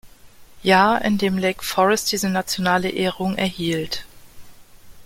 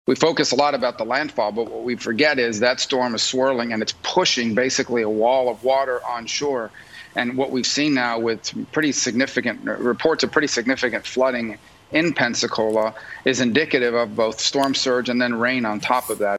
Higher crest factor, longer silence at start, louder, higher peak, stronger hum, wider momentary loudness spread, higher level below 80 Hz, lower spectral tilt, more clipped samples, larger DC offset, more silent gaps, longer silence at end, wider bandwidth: about the same, 20 dB vs 20 dB; about the same, 0.05 s vs 0.1 s; about the same, -20 LUFS vs -20 LUFS; about the same, -2 dBFS vs 0 dBFS; neither; about the same, 9 LU vs 7 LU; first, -50 dBFS vs -60 dBFS; about the same, -4 dB/octave vs -3 dB/octave; neither; neither; neither; about the same, 0 s vs 0 s; about the same, 16.5 kHz vs 15.5 kHz